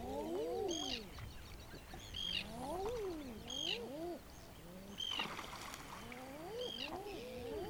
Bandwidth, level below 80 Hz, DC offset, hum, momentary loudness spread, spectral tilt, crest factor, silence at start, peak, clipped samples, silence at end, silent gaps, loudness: over 20 kHz; -58 dBFS; under 0.1%; none; 13 LU; -3.5 dB/octave; 18 dB; 0 s; -26 dBFS; under 0.1%; 0 s; none; -44 LUFS